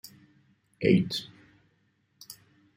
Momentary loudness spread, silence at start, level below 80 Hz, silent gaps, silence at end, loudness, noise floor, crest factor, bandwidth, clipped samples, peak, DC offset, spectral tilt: 25 LU; 0.8 s; -64 dBFS; none; 0.45 s; -27 LUFS; -71 dBFS; 24 dB; 16 kHz; under 0.1%; -8 dBFS; under 0.1%; -6.5 dB/octave